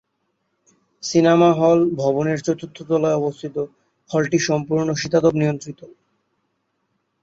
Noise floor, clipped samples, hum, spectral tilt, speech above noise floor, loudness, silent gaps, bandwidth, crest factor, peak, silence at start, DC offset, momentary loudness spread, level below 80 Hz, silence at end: -72 dBFS; under 0.1%; none; -6 dB/octave; 53 dB; -19 LUFS; none; 8 kHz; 18 dB; -2 dBFS; 1.05 s; under 0.1%; 14 LU; -60 dBFS; 1.35 s